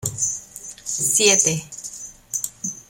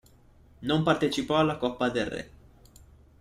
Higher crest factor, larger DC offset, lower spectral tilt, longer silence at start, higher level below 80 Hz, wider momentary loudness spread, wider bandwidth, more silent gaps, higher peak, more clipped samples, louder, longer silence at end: about the same, 22 dB vs 20 dB; neither; second, -1.5 dB/octave vs -5.5 dB/octave; second, 0 s vs 0.6 s; about the same, -56 dBFS vs -54 dBFS; first, 19 LU vs 13 LU; first, 16.5 kHz vs 14.5 kHz; neither; first, -2 dBFS vs -10 dBFS; neither; first, -19 LUFS vs -27 LUFS; second, 0.05 s vs 0.9 s